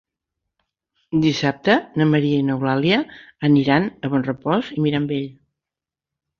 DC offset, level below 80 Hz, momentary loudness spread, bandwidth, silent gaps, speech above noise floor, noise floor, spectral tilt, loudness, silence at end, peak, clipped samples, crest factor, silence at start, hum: under 0.1%; -56 dBFS; 7 LU; 7 kHz; none; 69 dB; -88 dBFS; -7 dB/octave; -20 LUFS; 1.1 s; -2 dBFS; under 0.1%; 18 dB; 1.1 s; none